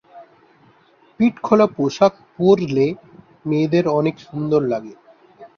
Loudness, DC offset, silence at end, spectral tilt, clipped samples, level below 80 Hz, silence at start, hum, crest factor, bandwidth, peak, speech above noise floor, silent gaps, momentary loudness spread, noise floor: -18 LUFS; under 0.1%; 0.1 s; -7.5 dB/octave; under 0.1%; -60 dBFS; 0.15 s; none; 18 dB; 7 kHz; -2 dBFS; 36 dB; none; 9 LU; -54 dBFS